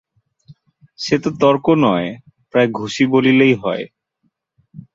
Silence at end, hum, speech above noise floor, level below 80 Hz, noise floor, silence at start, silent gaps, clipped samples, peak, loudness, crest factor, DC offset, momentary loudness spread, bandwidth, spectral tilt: 0.15 s; none; 53 dB; -58 dBFS; -68 dBFS; 0.5 s; none; under 0.1%; -2 dBFS; -16 LUFS; 16 dB; under 0.1%; 15 LU; 7.8 kHz; -6 dB/octave